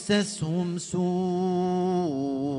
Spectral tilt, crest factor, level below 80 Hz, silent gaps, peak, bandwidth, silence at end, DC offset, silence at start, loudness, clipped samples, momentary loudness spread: -6 dB/octave; 14 dB; -62 dBFS; none; -12 dBFS; 11 kHz; 0 s; under 0.1%; 0 s; -27 LUFS; under 0.1%; 3 LU